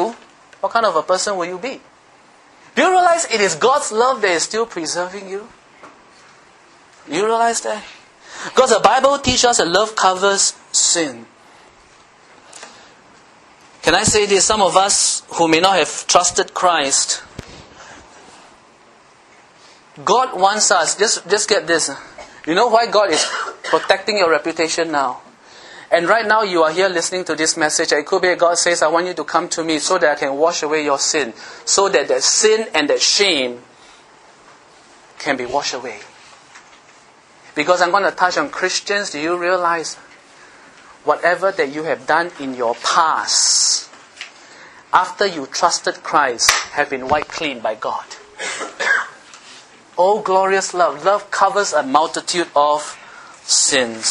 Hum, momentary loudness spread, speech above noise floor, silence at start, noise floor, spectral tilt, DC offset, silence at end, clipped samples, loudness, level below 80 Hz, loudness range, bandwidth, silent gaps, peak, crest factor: none; 13 LU; 32 dB; 0 s; -48 dBFS; -1.5 dB/octave; under 0.1%; 0 s; under 0.1%; -16 LUFS; -52 dBFS; 7 LU; 12 kHz; none; 0 dBFS; 18 dB